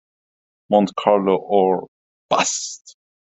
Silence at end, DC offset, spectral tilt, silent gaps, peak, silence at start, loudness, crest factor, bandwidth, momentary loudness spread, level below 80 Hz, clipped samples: 0.5 s; under 0.1%; -4 dB/octave; 1.88-2.29 s; 0 dBFS; 0.7 s; -19 LUFS; 20 dB; 8.4 kHz; 8 LU; -64 dBFS; under 0.1%